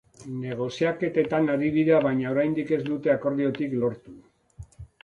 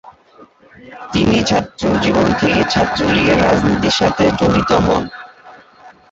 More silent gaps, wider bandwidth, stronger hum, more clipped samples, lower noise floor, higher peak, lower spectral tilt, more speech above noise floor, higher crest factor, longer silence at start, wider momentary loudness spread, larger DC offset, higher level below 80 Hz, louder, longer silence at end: neither; first, 9.2 kHz vs 8 kHz; neither; neither; about the same, -47 dBFS vs -45 dBFS; second, -8 dBFS vs -2 dBFS; first, -7.5 dB/octave vs -5.5 dB/octave; second, 23 dB vs 31 dB; about the same, 18 dB vs 14 dB; first, 0.2 s vs 0.05 s; first, 12 LU vs 6 LU; neither; second, -58 dBFS vs -34 dBFS; second, -25 LUFS vs -14 LUFS; about the same, 0.2 s vs 0.2 s